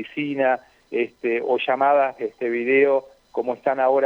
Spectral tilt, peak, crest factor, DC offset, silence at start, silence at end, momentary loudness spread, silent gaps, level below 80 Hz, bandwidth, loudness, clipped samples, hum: -7 dB/octave; -6 dBFS; 14 dB; under 0.1%; 0 s; 0 s; 10 LU; none; -70 dBFS; 6 kHz; -22 LUFS; under 0.1%; none